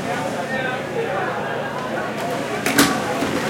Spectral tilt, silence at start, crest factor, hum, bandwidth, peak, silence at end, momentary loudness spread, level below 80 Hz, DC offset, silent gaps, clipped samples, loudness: -3.5 dB/octave; 0 s; 22 dB; none; 17 kHz; 0 dBFS; 0 s; 8 LU; -56 dBFS; under 0.1%; none; under 0.1%; -22 LUFS